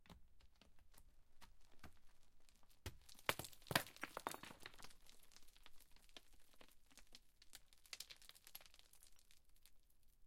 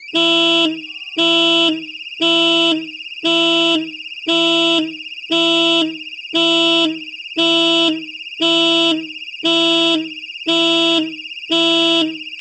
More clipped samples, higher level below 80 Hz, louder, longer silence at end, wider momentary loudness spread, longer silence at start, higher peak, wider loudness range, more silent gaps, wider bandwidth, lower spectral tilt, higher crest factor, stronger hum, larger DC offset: neither; about the same, -70 dBFS vs -68 dBFS; second, -49 LUFS vs -14 LUFS; about the same, 0 s vs 0 s; first, 24 LU vs 13 LU; about the same, 0 s vs 0 s; second, -18 dBFS vs -4 dBFS; first, 15 LU vs 1 LU; neither; first, 16 kHz vs 8.8 kHz; about the same, -2.5 dB/octave vs -2.5 dB/octave; first, 36 dB vs 14 dB; neither; neither